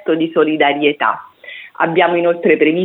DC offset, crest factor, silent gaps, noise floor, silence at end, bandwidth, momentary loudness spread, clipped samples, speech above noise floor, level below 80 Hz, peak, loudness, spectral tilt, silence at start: under 0.1%; 14 dB; none; -35 dBFS; 0 s; 4.1 kHz; 17 LU; under 0.1%; 22 dB; -68 dBFS; 0 dBFS; -14 LUFS; -8.5 dB/octave; 0.05 s